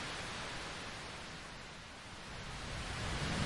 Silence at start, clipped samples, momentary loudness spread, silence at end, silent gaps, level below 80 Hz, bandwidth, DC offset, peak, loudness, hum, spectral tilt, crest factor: 0 s; under 0.1%; 9 LU; 0 s; none; -52 dBFS; 11.5 kHz; under 0.1%; -24 dBFS; -44 LUFS; none; -3.5 dB/octave; 20 dB